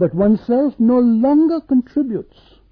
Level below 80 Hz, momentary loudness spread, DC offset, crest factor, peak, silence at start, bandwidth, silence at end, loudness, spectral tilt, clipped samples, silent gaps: -48 dBFS; 8 LU; under 0.1%; 10 dB; -6 dBFS; 0 s; 5 kHz; 0.5 s; -16 LUFS; -11.5 dB/octave; under 0.1%; none